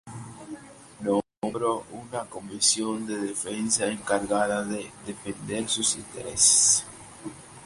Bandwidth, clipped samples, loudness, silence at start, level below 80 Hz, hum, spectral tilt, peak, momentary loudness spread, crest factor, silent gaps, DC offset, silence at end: 11.5 kHz; under 0.1%; -24 LUFS; 0.05 s; -60 dBFS; none; -2 dB/octave; -4 dBFS; 22 LU; 24 dB; none; under 0.1%; 0 s